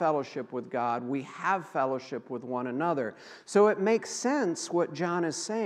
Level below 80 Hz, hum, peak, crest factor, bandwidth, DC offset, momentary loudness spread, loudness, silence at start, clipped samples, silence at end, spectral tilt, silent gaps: -88 dBFS; none; -10 dBFS; 18 dB; 12 kHz; under 0.1%; 12 LU; -30 LUFS; 0 s; under 0.1%; 0 s; -4.5 dB/octave; none